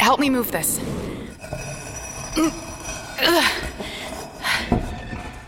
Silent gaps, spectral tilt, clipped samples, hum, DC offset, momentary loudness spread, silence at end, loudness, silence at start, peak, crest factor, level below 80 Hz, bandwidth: none; -3 dB/octave; under 0.1%; none; under 0.1%; 15 LU; 0 s; -23 LUFS; 0 s; -4 dBFS; 20 dB; -38 dBFS; 17 kHz